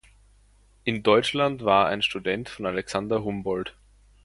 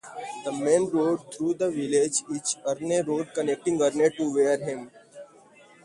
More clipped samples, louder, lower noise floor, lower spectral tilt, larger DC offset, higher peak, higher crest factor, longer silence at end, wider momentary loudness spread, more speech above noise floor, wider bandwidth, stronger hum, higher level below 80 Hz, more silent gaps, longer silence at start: neither; about the same, -25 LUFS vs -26 LUFS; first, -58 dBFS vs -54 dBFS; about the same, -5 dB/octave vs -4 dB/octave; neither; first, -4 dBFS vs -8 dBFS; about the same, 22 dB vs 18 dB; about the same, 0.55 s vs 0.6 s; about the same, 9 LU vs 10 LU; first, 34 dB vs 28 dB; about the same, 11.5 kHz vs 11.5 kHz; neither; first, -54 dBFS vs -70 dBFS; neither; first, 0.85 s vs 0.05 s